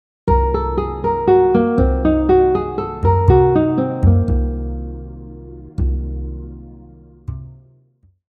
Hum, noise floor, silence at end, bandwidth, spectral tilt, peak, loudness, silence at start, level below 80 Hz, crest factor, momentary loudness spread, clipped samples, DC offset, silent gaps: none; -55 dBFS; 0.75 s; 4.7 kHz; -11 dB/octave; 0 dBFS; -16 LUFS; 0.25 s; -24 dBFS; 16 dB; 21 LU; under 0.1%; under 0.1%; none